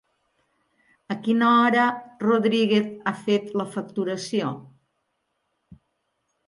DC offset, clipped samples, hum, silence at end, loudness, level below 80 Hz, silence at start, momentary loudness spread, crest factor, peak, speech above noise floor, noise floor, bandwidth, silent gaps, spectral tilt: under 0.1%; under 0.1%; none; 1.8 s; -23 LUFS; -72 dBFS; 1.1 s; 12 LU; 18 dB; -8 dBFS; 53 dB; -75 dBFS; 11.5 kHz; none; -5.5 dB/octave